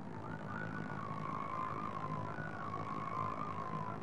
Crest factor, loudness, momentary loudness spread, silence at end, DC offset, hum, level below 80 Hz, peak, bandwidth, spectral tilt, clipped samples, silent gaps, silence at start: 14 dB; -42 LUFS; 3 LU; 0 s; 0.3%; none; -68 dBFS; -28 dBFS; 11 kHz; -7.5 dB/octave; under 0.1%; none; 0 s